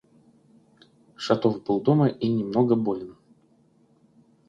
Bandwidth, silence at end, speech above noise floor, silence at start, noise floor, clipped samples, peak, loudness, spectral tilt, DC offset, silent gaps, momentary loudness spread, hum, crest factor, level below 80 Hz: 7.8 kHz; 1.35 s; 38 dB; 1.2 s; -61 dBFS; under 0.1%; -8 dBFS; -24 LUFS; -8 dB/octave; under 0.1%; none; 12 LU; none; 20 dB; -66 dBFS